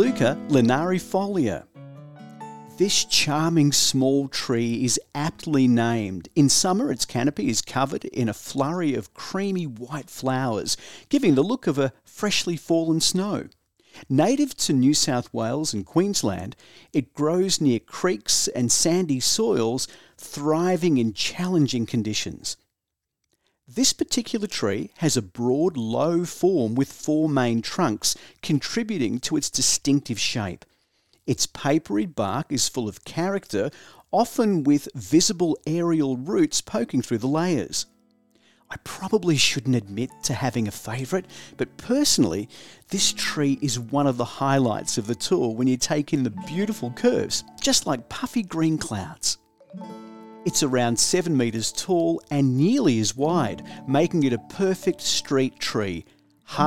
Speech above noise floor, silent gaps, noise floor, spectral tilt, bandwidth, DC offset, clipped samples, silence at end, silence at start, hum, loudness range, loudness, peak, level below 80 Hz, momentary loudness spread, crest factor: 61 dB; none; -84 dBFS; -4 dB/octave; 17 kHz; 0.4%; under 0.1%; 0 s; 0 s; none; 4 LU; -23 LUFS; -4 dBFS; -56 dBFS; 11 LU; 18 dB